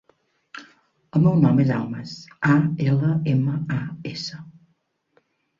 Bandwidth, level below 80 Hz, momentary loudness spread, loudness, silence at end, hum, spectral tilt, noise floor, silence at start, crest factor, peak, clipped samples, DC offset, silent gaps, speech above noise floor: 7.4 kHz; -58 dBFS; 24 LU; -22 LUFS; 1.1 s; none; -8 dB/octave; -69 dBFS; 0.55 s; 18 dB; -4 dBFS; under 0.1%; under 0.1%; none; 48 dB